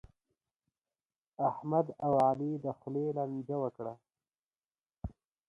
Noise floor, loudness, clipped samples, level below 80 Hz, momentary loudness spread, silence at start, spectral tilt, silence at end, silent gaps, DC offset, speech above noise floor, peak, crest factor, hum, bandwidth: under -90 dBFS; -34 LUFS; under 0.1%; -60 dBFS; 18 LU; 1.4 s; -10 dB/octave; 0.4 s; 4.39-4.51 s, 4.57-4.61 s, 4.86-4.90 s; under 0.1%; over 57 dB; -16 dBFS; 20 dB; none; 11 kHz